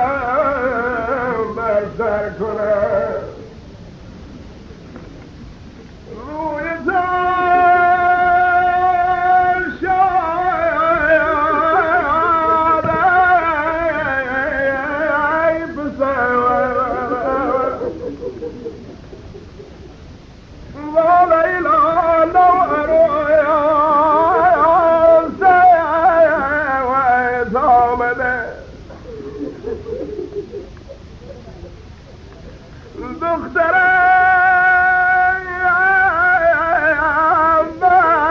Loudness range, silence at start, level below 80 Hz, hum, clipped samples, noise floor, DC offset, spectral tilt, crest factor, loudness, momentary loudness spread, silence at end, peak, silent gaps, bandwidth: 15 LU; 0 s; -40 dBFS; none; under 0.1%; -38 dBFS; under 0.1%; -7 dB/octave; 14 dB; -14 LUFS; 15 LU; 0 s; -2 dBFS; none; 6.8 kHz